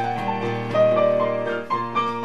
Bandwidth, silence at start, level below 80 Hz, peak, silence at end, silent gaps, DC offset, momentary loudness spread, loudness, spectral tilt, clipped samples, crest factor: 8 kHz; 0 s; -64 dBFS; -8 dBFS; 0 s; none; 0.8%; 8 LU; -22 LUFS; -7 dB/octave; under 0.1%; 14 dB